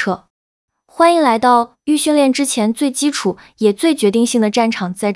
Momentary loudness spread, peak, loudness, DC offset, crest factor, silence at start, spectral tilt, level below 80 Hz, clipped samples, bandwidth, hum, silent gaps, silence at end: 7 LU; 0 dBFS; -15 LUFS; under 0.1%; 14 dB; 0 s; -4 dB/octave; -62 dBFS; under 0.1%; 12 kHz; none; 0.30-0.68 s; 0 s